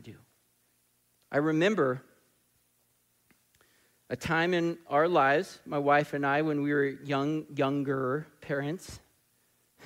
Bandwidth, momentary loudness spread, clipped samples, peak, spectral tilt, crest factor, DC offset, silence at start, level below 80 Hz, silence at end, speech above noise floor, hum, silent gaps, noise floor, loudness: 16 kHz; 11 LU; under 0.1%; -12 dBFS; -6.5 dB/octave; 20 dB; under 0.1%; 0.05 s; -66 dBFS; 0 s; 43 dB; 60 Hz at -65 dBFS; none; -71 dBFS; -29 LUFS